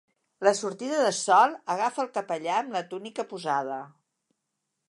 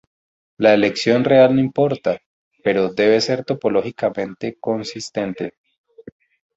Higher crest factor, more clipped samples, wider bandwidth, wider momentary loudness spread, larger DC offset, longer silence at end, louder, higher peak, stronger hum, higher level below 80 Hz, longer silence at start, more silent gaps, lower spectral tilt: about the same, 22 dB vs 18 dB; neither; first, 11.5 kHz vs 8 kHz; about the same, 14 LU vs 13 LU; neither; first, 1 s vs 0.55 s; second, -27 LUFS vs -18 LUFS; second, -6 dBFS vs 0 dBFS; neither; second, -86 dBFS vs -58 dBFS; second, 0.4 s vs 0.6 s; second, none vs 2.26-2.51 s, 5.58-5.64 s, 5.78-5.84 s; second, -3 dB/octave vs -5.5 dB/octave